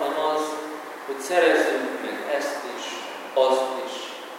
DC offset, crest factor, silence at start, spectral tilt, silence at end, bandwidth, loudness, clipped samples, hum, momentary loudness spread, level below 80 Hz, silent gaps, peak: under 0.1%; 18 dB; 0 s; -2 dB/octave; 0 s; 16.5 kHz; -25 LUFS; under 0.1%; none; 14 LU; under -90 dBFS; none; -6 dBFS